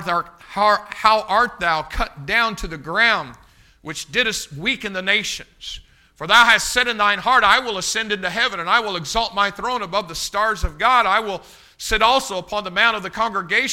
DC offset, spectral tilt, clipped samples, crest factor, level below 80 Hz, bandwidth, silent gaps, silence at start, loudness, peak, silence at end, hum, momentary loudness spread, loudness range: under 0.1%; -2 dB/octave; under 0.1%; 20 dB; -38 dBFS; 16.5 kHz; none; 0 s; -18 LUFS; 0 dBFS; 0 s; none; 15 LU; 4 LU